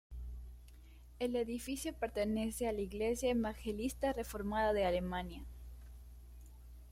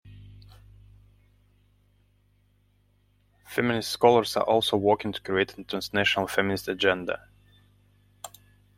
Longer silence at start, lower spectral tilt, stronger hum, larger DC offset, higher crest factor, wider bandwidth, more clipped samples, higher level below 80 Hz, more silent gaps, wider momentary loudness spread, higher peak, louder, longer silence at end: about the same, 0.1 s vs 0.05 s; about the same, -5 dB/octave vs -4.5 dB/octave; about the same, 60 Hz at -50 dBFS vs 50 Hz at -50 dBFS; neither; second, 16 dB vs 24 dB; about the same, 16 kHz vs 16.5 kHz; neither; first, -50 dBFS vs -60 dBFS; neither; first, 22 LU vs 15 LU; second, -22 dBFS vs -4 dBFS; second, -38 LUFS vs -25 LUFS; second, 0 s vs 0.5 s